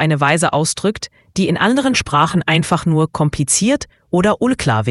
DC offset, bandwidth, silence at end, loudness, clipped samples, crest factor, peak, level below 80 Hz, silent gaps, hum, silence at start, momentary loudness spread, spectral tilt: under 0.1%; 12 kHz; 0 s; -16 LUFS; under 0.1%; 16 dB; 0 dBFS; -42 dBFS; none; none; 0 s; 6 LU; -4.5 dB/octave